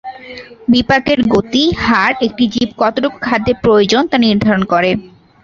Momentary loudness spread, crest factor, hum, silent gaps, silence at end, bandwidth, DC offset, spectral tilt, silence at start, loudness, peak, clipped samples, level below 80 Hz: 7 LU; 12 dB; none; none; 0.35 s; 7.4 kHz; under 0.1%; -5.5 dB/octave; 0.05 s; -13 LUFS; 0 dBFS; under 0.1%; -40 dBFS